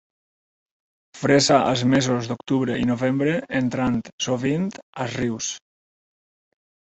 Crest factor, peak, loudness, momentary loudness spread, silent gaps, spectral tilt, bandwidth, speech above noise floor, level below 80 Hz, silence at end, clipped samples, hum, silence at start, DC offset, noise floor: 20 dB; -4 dBFS; -22 LUFS; 11 LU; 4.13-4.18 s, 4.83-4.93 s; -5 dB/octave; 8.2 kHz; over 69 dB; -54 dBFS; 1.25 s; under 0.1%; none; 1.15 s; under 0.1%; under -90 dBFS